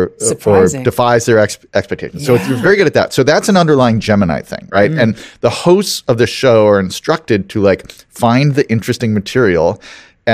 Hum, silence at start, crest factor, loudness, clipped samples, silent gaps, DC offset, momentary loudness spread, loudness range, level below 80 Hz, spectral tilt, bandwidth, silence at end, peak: none; 0 s; 12 dB; -12 LUFS; under 0.1%; none; 0.1%; 7 LU; 1 LU; -44 dBFS; -5.5 dB/octave; 15.5 kHz; 0 s; 0 dBFS